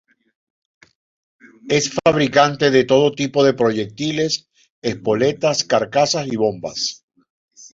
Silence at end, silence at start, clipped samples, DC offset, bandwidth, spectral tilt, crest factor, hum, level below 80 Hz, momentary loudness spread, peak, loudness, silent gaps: 0.05 s; 1.65 s; under 0.1%; under 0.1%; 7.8 kHz; -4 dB/octave; 18 dB; none; -56 dBFS; 9 LU; -2 dBFS; -18 LUFS; 4.70-4.82 s, 7.03-7.08 s, 7.30-7.48 s